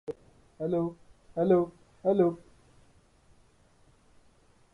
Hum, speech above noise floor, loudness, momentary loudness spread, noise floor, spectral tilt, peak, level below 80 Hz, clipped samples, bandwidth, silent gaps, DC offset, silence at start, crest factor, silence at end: none; 36 dB; -29 LUFS; 17 LU; -62 dBFS; -9.5 dB/octave; -12 dBFS; -64 dBFS; under 0.1%; 4.5 kHz; none; under 0.1%; 0.1 s; 20 dB; 2.35 s